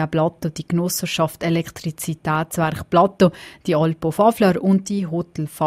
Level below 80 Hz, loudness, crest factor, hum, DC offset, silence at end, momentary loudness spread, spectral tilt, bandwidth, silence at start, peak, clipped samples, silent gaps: -52 dBFS; -20 LUFS; 16 dB; none; under 0.1%; 0 s; 10 LU; -6 dB/octave; 16 kHz; 0 s; -2 dBFS; under 0.1%; none